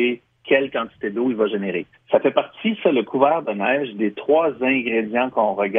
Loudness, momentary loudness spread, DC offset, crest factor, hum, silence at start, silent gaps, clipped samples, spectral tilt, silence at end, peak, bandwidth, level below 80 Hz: -21 LUFS; 7 LU; under 0.1%; 18 dB; none; 0 s; none; under 0.1%; -8.5 dB/octave; 0 s; -2 dBFS; 3.8 kHz; -66 dBFS